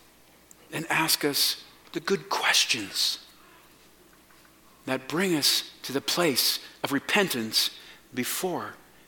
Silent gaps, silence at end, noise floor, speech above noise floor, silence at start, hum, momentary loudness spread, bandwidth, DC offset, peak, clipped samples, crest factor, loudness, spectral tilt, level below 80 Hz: none; 0.3 s; -57 dBFS; 30 dB; 0.7 s; none; 14 LU; 17.5 kHz; under 0.1%; -6 dBFS; under 0.1%; 22 dB; -25 LUFS; -2 dB/octave; -70 dBFS